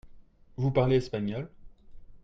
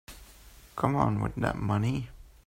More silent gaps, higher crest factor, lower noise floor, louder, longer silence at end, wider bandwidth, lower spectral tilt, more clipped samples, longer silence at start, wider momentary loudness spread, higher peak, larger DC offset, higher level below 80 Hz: neither; about the same, 18 dB vs 20 dB; about the same, -52 dBFS vs -53 dBFS; about the same, -29 LUFS vs -29 LUFS; second, 0.05 s vs 0.2 s; second, 7.6 kHz vs 16 kHz; about the same, -8.5 dB/octave vs -7.5 dB/octave; neither; about the same, 0.05 s vs 0.1 s; about the same, 19 LU vs 19 LU; about the same, -12 dBFS vs -10 dBFS; neither; about the same, -52 dBFS vs -48 dBFS